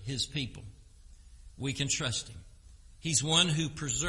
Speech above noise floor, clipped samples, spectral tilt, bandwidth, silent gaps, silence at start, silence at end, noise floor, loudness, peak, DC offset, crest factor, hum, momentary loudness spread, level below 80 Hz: 22 dB; under 0.1%; -2.5 dB/octave; 11.5 kHz; none; 0 s; 0 s; -54 dBFS; -30 LUFS; -10 dBFS; under 0.1%; 22 dB; none; 15 LU; -52 dBFS